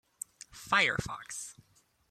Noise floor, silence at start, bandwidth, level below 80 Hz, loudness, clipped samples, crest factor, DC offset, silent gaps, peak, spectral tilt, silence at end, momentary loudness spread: -68 dBFS; 0.5 s; 16 kHz; -60 dBFS; -31 LUFS; under 0.1%; 24 dB; under 0.1%; none; -12 dBFS; -2 dB/octave; 0.6 s; 19 LU